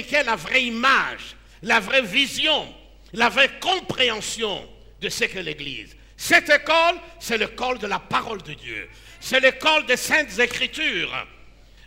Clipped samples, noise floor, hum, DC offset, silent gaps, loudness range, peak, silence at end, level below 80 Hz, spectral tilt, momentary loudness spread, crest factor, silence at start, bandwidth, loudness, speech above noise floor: under 0.1%; -47 dBFS; none; under 0.1%; none; 2 LU; -2 dBFS; 0.35 s; -50 dBFS; -2 dB/octave; 15 LU; 20 dB; 0 s; 16 kHz; -20 LUFS; 25 dB